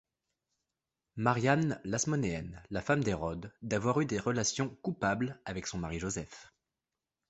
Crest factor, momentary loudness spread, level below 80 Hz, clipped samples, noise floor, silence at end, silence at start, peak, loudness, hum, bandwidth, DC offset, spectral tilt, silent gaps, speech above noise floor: 24 dB; 10 LU; -56 dBFS; under 0.1%; under -90 dBFS; 0.8 s; 1.15 s; -10 dBFS; -33 LUFS; none; 8.4 kHz; under 0.1%; -5 dB/octave; none; over 57 dB